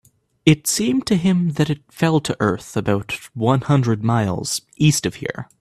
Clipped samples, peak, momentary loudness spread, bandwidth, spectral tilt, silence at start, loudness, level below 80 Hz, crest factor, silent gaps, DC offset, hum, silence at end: under 0.1%; 0 dBFS; 7 LU; 14.5 kHz; -5.5 dB/octave; 0.45 s; -19 LUFS; -50 dBFS; 18 dB; none; under 0.1%; none; 0.15 s